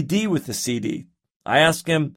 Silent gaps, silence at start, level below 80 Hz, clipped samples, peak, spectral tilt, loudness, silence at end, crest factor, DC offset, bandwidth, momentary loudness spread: 1.36-1.40 s; 0 s; -56 dBFS; under 0.1%; -4 dBFS; -4.5 dB/octave; -21 LUFS; 0.05 s; 18 dB; under 0.1%; 16.5 kHz; 14 LU